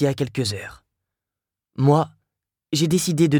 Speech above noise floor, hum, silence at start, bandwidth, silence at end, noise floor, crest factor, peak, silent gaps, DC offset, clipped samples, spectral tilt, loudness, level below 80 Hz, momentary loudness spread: 68 dB; none; 0 s; 18.5 kHz; 0 s; -87 dBFS; 18 dB; -4 dBFS; none; under 0.1%; under 0.1%; -5.5 dB/octave; -21 LUFS; -56 dBFS; 15 LU